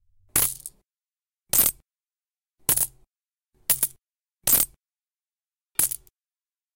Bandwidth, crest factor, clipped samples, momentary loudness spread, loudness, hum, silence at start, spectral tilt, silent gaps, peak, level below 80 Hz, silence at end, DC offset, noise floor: 17 kHz; 24 dB; under 0.1%; 12 LU; -22 LUFS; none; 0.35 s; -0.5 dB/octave; none; -6 dBFS; -54 dBFS; 0.8 s; under 0.1%; under -90 dBFS